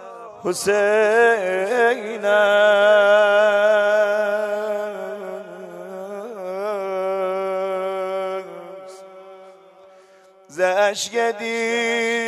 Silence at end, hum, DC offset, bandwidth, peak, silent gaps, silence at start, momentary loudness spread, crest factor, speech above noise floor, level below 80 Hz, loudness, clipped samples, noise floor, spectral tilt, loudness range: 0 s; none; under 0.1%; 13.5 kHz; -4 dBFS; none; 0 s; 19 LU; 16 dB; 32 dB; -74 dBFS; -19 LUFS; under 0.1%; -50 dBFS; -2.5 dB/octave; 11 LU